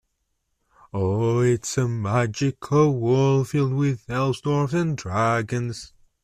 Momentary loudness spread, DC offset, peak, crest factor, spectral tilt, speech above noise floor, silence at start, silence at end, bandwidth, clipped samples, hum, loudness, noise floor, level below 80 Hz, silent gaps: 8 LU; under 0.1%; -8 dBFS; 14 dB; -6.5 dB/octave; 52 dB; 0.95 s; 0.4 s; 13.5 kHz; under 0.1%; none; -23 LUFS; -74 dBFS; -54 dBFS; none